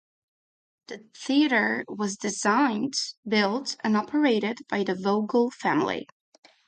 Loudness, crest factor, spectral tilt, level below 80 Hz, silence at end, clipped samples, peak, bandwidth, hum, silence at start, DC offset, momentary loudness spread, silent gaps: -25 LUFS; 16 dB; -4 dB/octave; -74 dBFS; 0.65 s; under 0.1%; -10 dBFS; 9.4 kHz; none; 0.9 s; under 0.1%; 8 LU; 3.17-3.23 s